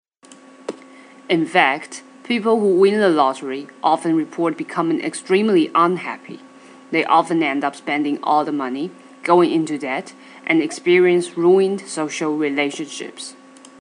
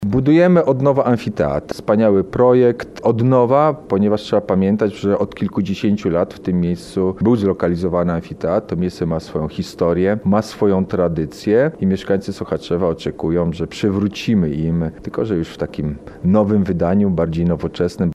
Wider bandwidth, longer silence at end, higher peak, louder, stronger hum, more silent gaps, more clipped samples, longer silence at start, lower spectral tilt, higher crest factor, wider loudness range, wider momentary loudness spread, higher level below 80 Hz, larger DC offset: second, 10 kHz vs 12 kHz; first, 0.5 s vs 0 s; about the same, 0 dBFS vs -2 dBFS; about the same, -18 LUFS vs -17 LUFS; neither; neither; neither; first, 0.3 s vs 0 s; second, -5 dB/octave vs -8 dB/octave; first, 20 dB vs 14 dB; about the same, 2 LU vs 4 LU; first, 17 LU vs 8 LU; second, -80 dBFS vs -42 dBFS; neither